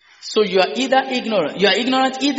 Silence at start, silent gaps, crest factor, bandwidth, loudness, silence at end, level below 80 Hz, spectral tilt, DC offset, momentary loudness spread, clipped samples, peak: 0.2 s; none; 16 dB; 8 kHz; -17 LUFS; 0 s; -66 dBFS; -1.5 dB/octave; under 0.1%; 4 LU; under 0.1%; 0 dBFS